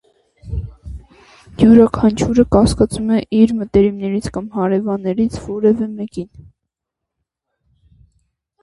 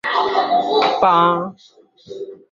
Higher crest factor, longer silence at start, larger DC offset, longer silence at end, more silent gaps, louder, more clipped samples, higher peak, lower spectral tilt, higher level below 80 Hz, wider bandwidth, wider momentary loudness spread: about the same, 16 dB vs 16 dB; first, 0.45 s vs 0.05 s; neither; first, 2.35 s vs 0.15 s; neither; about the same, -15 LUFS vs -16 LUFS; neither; about the same, 0 dBFS vs -2 dBFS; first, -7 dB/octave vs -5.5 dB/octave; first, -34 dBFS vs -60 dBFS; first, 11.5 kHz vs 7.4 kHz; about the same, 18 LU vs 19 LU